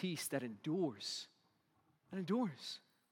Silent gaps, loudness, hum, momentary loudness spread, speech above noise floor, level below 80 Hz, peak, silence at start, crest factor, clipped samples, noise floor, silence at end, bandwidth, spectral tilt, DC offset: none; -42 LUFS; none; 11 LU; 36 dB; under -90 dBFS; -26 dBFS; 0 s; 18 dB; under 0.1%; -77 dBFS; 0.35 s; 18 kHz; -4.5 dB/octave; under 0.1%